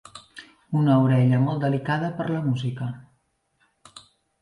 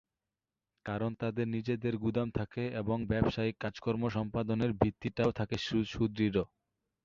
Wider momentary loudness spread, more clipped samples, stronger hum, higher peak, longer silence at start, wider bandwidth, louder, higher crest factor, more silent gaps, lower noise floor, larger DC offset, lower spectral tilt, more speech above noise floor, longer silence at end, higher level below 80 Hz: first, 24 LU vs 5 LU; neither; neither; about the same, -8 dBFS vs -10 dBFS; second, 0.15 s vs 0.85 s; first, 10.5 kHz vs 7.4 kHz; first, -23 LUFS vs -34 LUFS; second, 16 dB vs 24 dB; neither; second, -69 dBFS vs under -90 dBFS; neither; about the same, -8.5 dB/octave vs -7.5 dB/octave; second, 47 dB vs over 57 dB; second, 0.4 s vs 0.6 s; second, -62 dBFS vs -54 dBFS